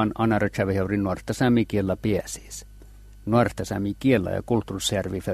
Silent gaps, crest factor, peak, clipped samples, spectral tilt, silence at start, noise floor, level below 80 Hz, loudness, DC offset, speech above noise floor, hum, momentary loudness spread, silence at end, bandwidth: none; 18 dB; -6 dBFS; under 0.1%; -6 dB/octave; 0 s; -46 dBFS; -46 dBFS; -24 LUFS; under 0.1%; 22 dB; 50 Hz at -45 dBFS; 9 LU; 0 s; 14 kHz